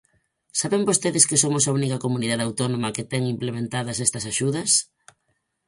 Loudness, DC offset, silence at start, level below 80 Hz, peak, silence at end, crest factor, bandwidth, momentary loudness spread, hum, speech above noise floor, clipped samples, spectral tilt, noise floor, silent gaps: -22 LUFS; under 0.1%; 0.55 s; -60 dBFS; 0 dBFS; 0.85 s; 24 dB; 11.5 kHz; 10 LU; none; 50 dB; under 0.1%; -3.5 dB/octave; -73 dBFS; none